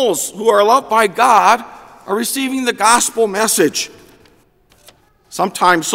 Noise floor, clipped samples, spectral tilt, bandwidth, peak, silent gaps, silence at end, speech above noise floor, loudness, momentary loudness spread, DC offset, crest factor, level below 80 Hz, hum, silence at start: -53 dBFS; under 0.1%; -2 dB/octave; 16.5 kHz; 0 dBFS; none; 0 s; 39 dB; -14 LUFS; 10 LU; under 0.1%; 16 dB; -58 dBFS; none; 0 s